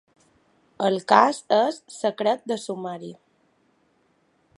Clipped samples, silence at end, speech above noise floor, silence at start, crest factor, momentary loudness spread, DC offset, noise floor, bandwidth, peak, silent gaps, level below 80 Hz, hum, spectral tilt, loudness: under 0.1%; 1.45 s; 43 dB; 0.8 s; 24 dB; 15 LU; under 0.1%; -66 dBFS; 11.5 kHz; 0 dBFS; none; -78 dBFS; none; -4.5 dB/octave; -23 LUFS